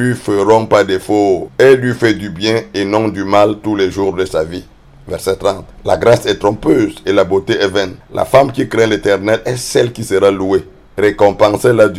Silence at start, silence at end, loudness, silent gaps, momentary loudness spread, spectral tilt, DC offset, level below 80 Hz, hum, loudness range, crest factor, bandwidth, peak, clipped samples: 0 s; 0 s; -13 LUFS; none; 8 LU; -5.5 dB/octave; under 0.1%; -40 dBFS; none; 3 LU; 12 dB; 15 kHz; 0 dBFS; 0.2%